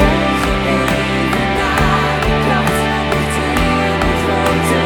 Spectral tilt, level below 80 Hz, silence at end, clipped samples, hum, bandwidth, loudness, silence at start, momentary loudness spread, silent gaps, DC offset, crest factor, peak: -5 dB/octave; -24 dBFS; 0 s; under 0.1%; none; over 20 kHz; -15 LUFS; 0 s; 2 LU; none; under 0.1%; 14 dB; 0 dBFS